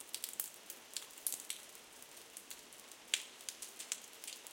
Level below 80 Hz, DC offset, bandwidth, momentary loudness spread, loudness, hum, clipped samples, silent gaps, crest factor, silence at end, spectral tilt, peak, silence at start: -88 dBFS; under 0.1%; 17 kHz; 14 LU; -44 LUFS; none; under 0.1%; none; 34 dB; 0 s; 2 dB/octave; -12 dBFS; 0 s